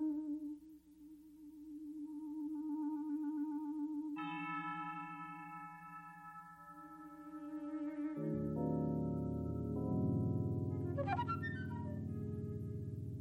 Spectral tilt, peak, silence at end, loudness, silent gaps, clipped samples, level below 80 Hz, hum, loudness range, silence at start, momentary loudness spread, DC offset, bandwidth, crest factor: -9.5 dB/octave; -24 dBFS; 0 s; -42 LUFS; none; under 0.1%; -62 dBFS; none; 8 LU; 0 s; 16 LU; under 0.1%; 13 kHz; 18 dB